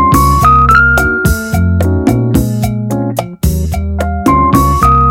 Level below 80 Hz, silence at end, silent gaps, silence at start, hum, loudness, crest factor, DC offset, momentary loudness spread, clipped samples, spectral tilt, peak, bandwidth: -18 dBFS; 0 s; none; 0 s; none; -10 LUFS; 10 dB; under 0.1%; 9 LU; 0.3%; -6.5 dB/octave; 0 dBFS; 17.5 kHz